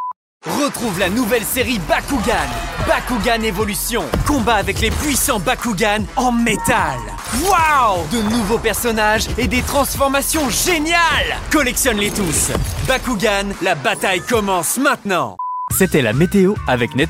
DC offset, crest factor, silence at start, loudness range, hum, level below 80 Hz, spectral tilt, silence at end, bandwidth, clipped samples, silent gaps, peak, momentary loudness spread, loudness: under 0.1%; 16 dB; 0 s; 2 LU; none; -30 dBFS; -3.5 dB/octave; 0 s; 16 kHz; under 0.1%; 0.16-0.40 s; 0 dBFS; 5 LU; -16 LUFS